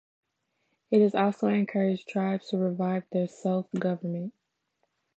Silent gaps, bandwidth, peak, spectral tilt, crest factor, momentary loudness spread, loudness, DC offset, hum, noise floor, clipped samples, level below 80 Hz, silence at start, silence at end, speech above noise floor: none; 8 kHz; -12 dBFS; -8 dB/octave; 18 dB; 8 LU; -28 LUFS; under 0.1%; none; -77 dBFS; under 0.1%; -80 dBFS; 0.9 s; 0.85 s; 50 dB